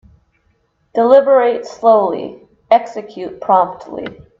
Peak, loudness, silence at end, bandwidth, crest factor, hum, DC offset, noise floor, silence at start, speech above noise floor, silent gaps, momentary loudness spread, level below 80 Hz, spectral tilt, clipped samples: 0 dBFS; -14 LUFS; 0.25 s; 7.4 kHz; 14 dB; none; under 0.1%; -61 dBFS; 0.95 s; 47 dB; none; 18 LU; -58 dBFS; -6 dB/octave; under 0.1%